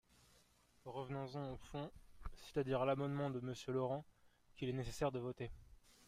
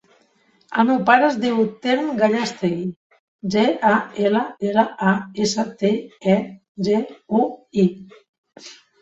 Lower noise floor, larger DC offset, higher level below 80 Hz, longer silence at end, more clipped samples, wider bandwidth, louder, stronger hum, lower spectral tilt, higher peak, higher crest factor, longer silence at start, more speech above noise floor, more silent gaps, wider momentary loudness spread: first, -72 dBFS vs -60 dBFS; neither; about the same, -60 dBFS vs -62 dBFS; second, 0.05 s vs 0.3 s; neither; first, 15.5 kHz vs 8 kHz; second, -44 LUFS vs -20 LUFS; neither; about the same, -6.5 dB/octave vs -5.5 dB/octave; second, -28 dBFS vs -2 dBFS; about the same, 18 dB vs 18 dB; first, 0.85 s vs 0.7 s; second, 30 dB vs 40 dB; second, none vs 2.96-3.10 s, 3.20-3.39 s, 6.69-6.75 s, 8.29-8.44 s; first, 15 LU vs 10 LU